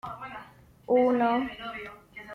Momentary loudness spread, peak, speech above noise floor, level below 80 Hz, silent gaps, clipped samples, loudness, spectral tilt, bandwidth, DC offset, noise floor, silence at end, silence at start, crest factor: 20 LU; -14 dBFS; 25 dB; -62 dBFS; none; under 0.1%; -26 LUFS; -7 dB/octave; 6 kHz; under 0.1%; -51 dBFS; 0 s; 0.05 s; 16 dB